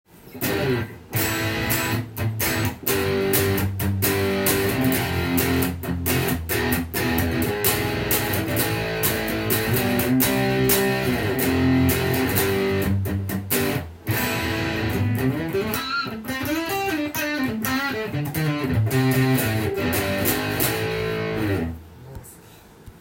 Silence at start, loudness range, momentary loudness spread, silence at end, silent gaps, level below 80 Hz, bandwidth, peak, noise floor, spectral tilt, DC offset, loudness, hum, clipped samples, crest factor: 0.15 s; 4 LU; 6 LU; 0 s; none; -44 dBFS; 17 kHz; -2 dBFS; -47 dBFS; -4.5 dB/octave; under 0.1%; -22 LUFS; none; under 0.1%; 20 dB